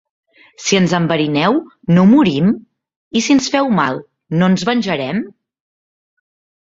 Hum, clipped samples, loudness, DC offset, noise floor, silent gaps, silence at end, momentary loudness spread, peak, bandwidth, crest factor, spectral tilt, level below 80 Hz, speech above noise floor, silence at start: none; under 0.1%; -15 LUFS; under 0.1%; under -90 dBFS; 2.96-3.11 s; 1.4 s; 11 LU; 0 dBFS; 7.8 kHz; 16 dB; -5.5 dB/octave; -54 dBFS; over 76 dB; 0.6 s